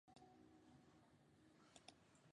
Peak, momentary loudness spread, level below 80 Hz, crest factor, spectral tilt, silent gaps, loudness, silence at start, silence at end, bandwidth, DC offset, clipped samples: -42 dBFS; 3 LU; -88 dBFS; 28 dB; -4 dB/octave; none; -68 LUFS; 0.05 s; 0 s; 10 kHz; under 0.1%; under 0.1%